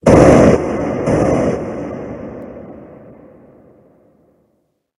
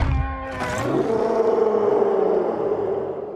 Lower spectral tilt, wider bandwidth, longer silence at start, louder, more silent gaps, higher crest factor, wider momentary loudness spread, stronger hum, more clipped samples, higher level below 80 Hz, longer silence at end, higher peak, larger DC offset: about the same, -7.5 dB/octave vs -7 dB/octave; about the same, 12 kHz vs 12.5 kHz; about the same, 0.05 s vs 0 s; first, -13 LUFS vs -22 LUFS; neither; about the same, 16 dB vs 14 dB; first, 24 LU vs 7 LU; neither; first, 0.3% vs under 0.1%; about the same, -34 dBFS vs -34 dBFS; first, 2.15 s vs 0 s; first, 0 dBFS vs -8 dBFS; neither